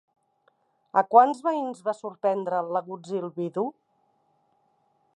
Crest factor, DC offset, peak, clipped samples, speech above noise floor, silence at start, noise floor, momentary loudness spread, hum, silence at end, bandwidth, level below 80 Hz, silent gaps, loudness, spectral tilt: 24 dB; under 0.1%; -4 dBFS; under 0.1%; 44 dB; 0.95 s; -69 dBFS; 13 LU; none; 1.45 s; 10.5 kHz; -86 dBFS; none; -25 LUFS; -7 dB/octave